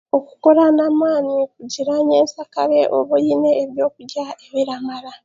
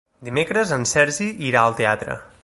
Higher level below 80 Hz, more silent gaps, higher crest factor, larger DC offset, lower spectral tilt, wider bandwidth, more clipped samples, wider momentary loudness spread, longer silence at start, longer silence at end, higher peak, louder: second, -68 dBFS vs -52 dBFS; neither; about the same, 16 dB vs 20 dB; neither; about the same, -5 dB/octave vs -4 dB/octave; second, 7.6 kHz vs 11.5 kHz; neither; first, 12 LU vs 8 LU; about the same, 0.15 s vs 0.2 s; about the same, 0.1 s vs 0.2 s; about the same, 0 dBFS vs -2 dBFS; first, -17 LUFS vs -20 LUFS